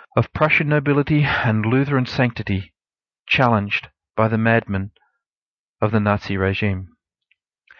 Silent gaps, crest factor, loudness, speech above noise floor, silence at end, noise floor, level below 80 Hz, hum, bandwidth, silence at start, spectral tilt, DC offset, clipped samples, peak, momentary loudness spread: 5.26-5.30 s, 5.37-5.74 s; 18 dB; -19 LUFS; over 71 dB; 0.95 s; under -90 dBFS; -48 dBFS; none; 6.6 kHz; 0.15 s; -8 dB/octave; under 0.1%; under 0.1%; -2 dBFS; 10 LU